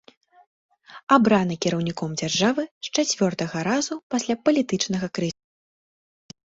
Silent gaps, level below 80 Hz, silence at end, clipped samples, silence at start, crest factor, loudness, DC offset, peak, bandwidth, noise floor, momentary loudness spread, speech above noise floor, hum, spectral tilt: 1.03-1.07 s, 2.71-2.81 s, 4.03-4.10 s; -62 dBFS; 1.25 s; under 0.1%; 0.9 s; 22 dB; -23 LUFS; under 0.1%; -2 dBFS; 8 kHz; under -90 dBFS; 9 LU; over 67 dB; none; -4.5 dB/octave